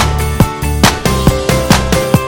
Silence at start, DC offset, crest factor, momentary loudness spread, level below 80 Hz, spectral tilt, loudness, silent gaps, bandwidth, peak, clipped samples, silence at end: 0 s; under 0.1%; 12 dB; 3 LU; -18 dBFS; -5 dB/octave; -12 LUFS; none; 17.5 kHz; 0 dBFS; 0.3%; 0 s